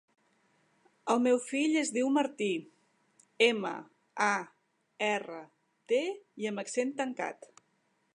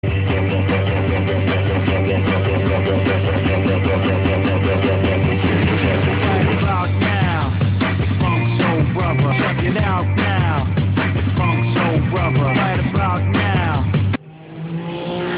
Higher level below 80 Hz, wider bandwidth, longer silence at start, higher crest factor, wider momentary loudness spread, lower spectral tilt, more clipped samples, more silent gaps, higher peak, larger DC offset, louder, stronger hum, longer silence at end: second, -88 dBFS vs -34 dBFS; first, 11 kHz vs 4.8 kHz; first, 1.05 s vs 0.05 s; first, 22 dB vs 14 dB; first, 16 LU vs 2 LU; second, -3.5 dB/octave vs -12 dB/octave; neither; neither; second, -10 dBFS vs -4 dBFS; neither; second, -31 LUFS vs -18 LUFS; neither; first, 0.85 s vs 0 s